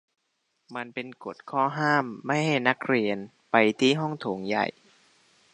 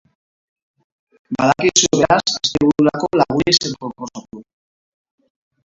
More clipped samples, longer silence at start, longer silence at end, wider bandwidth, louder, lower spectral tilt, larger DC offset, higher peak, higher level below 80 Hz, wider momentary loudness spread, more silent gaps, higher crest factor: neither; second, 0.7 s vs 1.3 s; second, 0.85 s vs 1.25 s; first, 10.5 kHz vs 8 kHz; second, -26 LUFS vs -15 LUFS; first, -5.5 dB/octave vs -3.5 dB/octave; neither; second, -4 dBFS vs 0 dBFS; second, -74 dBFS vs -48 dBFS; about the same, 14 LU vs 16 LU; neither; about the same, 24 dB vs 20 dB